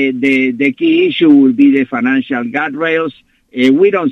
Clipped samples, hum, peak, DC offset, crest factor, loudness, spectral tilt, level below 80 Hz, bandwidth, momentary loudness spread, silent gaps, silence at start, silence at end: under 0.1%; none; 0 dBFS; under 0.1%; 12 dB; -12 LUFS; -6.5 dB/octave; -60 dBFS; 6.2 kHz; 9 LU; none; 0 s; 0 s